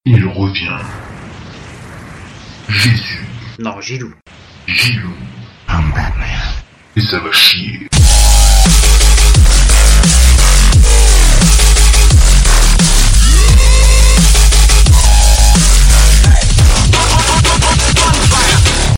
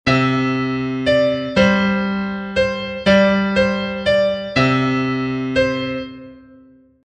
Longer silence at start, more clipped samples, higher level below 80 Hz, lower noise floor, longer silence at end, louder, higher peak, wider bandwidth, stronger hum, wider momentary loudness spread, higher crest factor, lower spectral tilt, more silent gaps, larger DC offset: about the same, 0.05 s vs 0.05 s; first, 0.2% vs under 0.1%; first, -10 dBFS vs -42 dBFS; second, -31 dBFS vs -48 dBFS; second, 0 s vs 0.65 s; first, -9 LUFS vs -17 LUFS; about the same, 0 dBFS vs -2 dBFS; first, 16.5 kHz vs 9.4 kHz; neither; first, 15 LU vs 7 LU; second, 8 dB vs 16 dB; second, -3 dB/octave vs -6.5 dB/octave; neither; neither